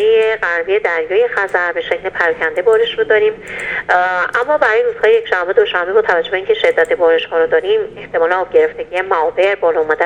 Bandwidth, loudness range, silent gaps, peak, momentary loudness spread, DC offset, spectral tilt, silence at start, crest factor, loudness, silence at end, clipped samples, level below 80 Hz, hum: 9.4 kHz; 1 LU; none; 0 dBFS; 5 LU; under 0.1%; -4 dB/octave; 0 s; 14 dB; -14 LUFS; 0 s; under 0.1%; -50 dBFS; none